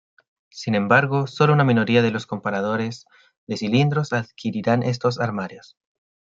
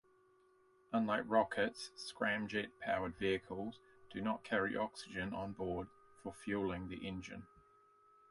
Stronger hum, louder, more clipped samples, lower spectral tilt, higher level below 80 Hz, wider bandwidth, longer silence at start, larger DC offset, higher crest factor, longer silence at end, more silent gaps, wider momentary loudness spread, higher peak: neither; first, -21 LUFS vs -40 LUFS; neither; first, -7 dB/octave vs -5.5 dB/octave; about the same, -62 dBFS vs -66 dBFS; second, 7.6 kHz vs 11.5 kHz; second, 0.55 s vs 0.9 s; neither; about the same, 20 dB vs 22 dB; second, 0.65 s vs 0.85 s; first, 3.37-3.47 s vs none; about the same, 13 LU vs 13 LU; first, -2 dBFS vs -18 dBFS